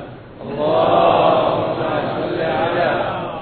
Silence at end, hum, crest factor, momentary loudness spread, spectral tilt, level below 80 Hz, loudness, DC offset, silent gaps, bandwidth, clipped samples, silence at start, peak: 0 s; none; 16 dB; 10 LU; -9.5 dB/octave; -46 dBFS; -17 LUFS; under 0.1%; none; 4.5 kHz; under 0.1%; 0 s; -2 dBFS